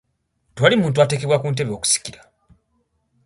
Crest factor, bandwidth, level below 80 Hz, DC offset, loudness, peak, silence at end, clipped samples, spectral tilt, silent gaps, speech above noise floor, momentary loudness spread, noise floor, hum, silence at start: 20 dB; 11.5 kHz; -56 dBFS; under 0.1%; -18 LUFS; 0 dBFS; 1.15 s; under 0.1%; -4 dB/octave; none; 50 dB; 6 LU; -68 dBFS; none; 0.55 s